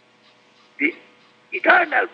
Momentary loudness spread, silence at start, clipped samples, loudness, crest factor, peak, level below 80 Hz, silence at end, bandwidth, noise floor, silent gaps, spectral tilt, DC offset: 9 LU; 0.8 s; under 0.1%; -19 LUFS; 20 dB; -2 dBFS; -88 dBFS; 0.05 s; 6.8 kHz; -55 dBFS; none; -4.5 dB/octave; under 0.1%